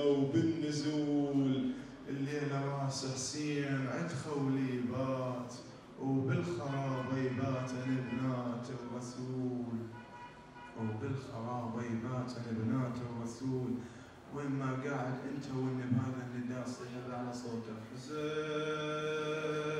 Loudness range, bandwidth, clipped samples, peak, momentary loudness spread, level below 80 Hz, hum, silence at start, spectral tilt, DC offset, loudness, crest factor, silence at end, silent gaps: 5 LU; 11 kHz; under 0.1%; -20 dBFS; 10 LU; -70 dBFS; none; 0 s; -6.5 dB/octave; under 0.1%; -37 LUFS; 18 dB; 0 s; none